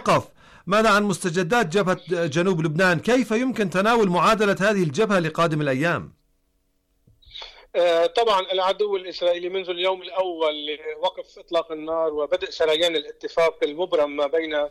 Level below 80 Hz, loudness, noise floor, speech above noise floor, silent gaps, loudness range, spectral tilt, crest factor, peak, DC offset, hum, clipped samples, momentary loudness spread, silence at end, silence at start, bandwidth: -56 dBFS; -22 LUFS; -68 dBFS; 46 dB; none; 5 LU; -5 dB/octave; 12 dB; -12 dBFS; under 0.1%; none; under 0.1%; 9 LU; 0 s; 0 s; 15 kHz